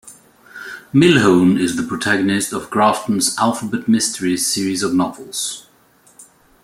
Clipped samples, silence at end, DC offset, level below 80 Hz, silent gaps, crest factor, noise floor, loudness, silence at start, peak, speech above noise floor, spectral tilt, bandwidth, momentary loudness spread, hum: under 0.1%; 0.4 s; under 0.1%; -56 dBFS; none; 16 dB; -52 dBFS; -16 LUFS; 0.05 s; -2 dBFS; 36 dB; -4 dB/octave; 16 kHz; 11 LU; none